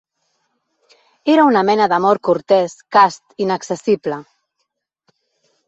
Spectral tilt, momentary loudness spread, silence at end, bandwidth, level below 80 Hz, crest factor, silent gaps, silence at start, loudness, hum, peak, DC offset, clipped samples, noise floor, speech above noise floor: -5.5 dB/octave; 10 LU; 1.45 s; 8.2 kHz; -64 dBFS; 16 dB; none; 1.25 s; -16 LUFS; none; -2 dBFS; under 0.1%; under 0.1%; -73 dBFS; 58 dB